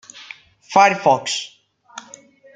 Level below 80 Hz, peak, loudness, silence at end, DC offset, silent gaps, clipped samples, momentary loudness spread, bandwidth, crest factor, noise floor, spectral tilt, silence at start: -70 dBFS; -2 dBFS; -17 LUFS; 0.55 s; under 0.1%; none; under 0.1%; 25 LU; 9.4 kHz; 20 dB; -46 dBFS; -3 dB/octave; 0.15 s